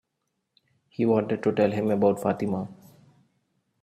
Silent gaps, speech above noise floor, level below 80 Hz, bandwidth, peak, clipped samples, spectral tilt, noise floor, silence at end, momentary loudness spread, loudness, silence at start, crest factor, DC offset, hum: none; 55 dB; -66 dBFS; 14.5 kHz; -8 dBFS; under 0.1%; -8 dB/octave; -79 dBFS; 1.1 s; 10 LU; -25 LUFS; 1 s; 18 dB; under 0.1%; none